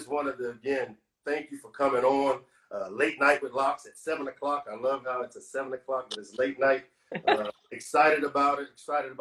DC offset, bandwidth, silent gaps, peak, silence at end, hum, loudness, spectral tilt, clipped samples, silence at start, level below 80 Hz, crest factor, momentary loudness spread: under 0.1%; 12.5 kHz; none; -8 dBFS; 0.05 s; none; -29 LUFS; -4 dB/octave; under 0.1%; 0 s; -70 dBFS; 22 dB; 13 LU